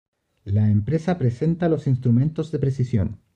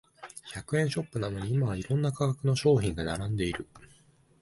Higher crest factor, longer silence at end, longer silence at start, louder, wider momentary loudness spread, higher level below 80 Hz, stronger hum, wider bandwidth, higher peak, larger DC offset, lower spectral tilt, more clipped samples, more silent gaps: second, 12 dB vs 18 dB; second, 0.2 s vs 0.55 s; first, 0.45 s vs 0.2 s; first, -22 LUFS vs -29 LUFS; second, 5 LU vs 16 LU; about the same, -48 dBFS vs -50 dBFS; neither; second, 8.2 kHz vs 11.5 kHz; about the same, -10 dBFS vs -12 dBFS; neither; first, -9.5 dB/octave vs -6.5 dB/octave; neither; neither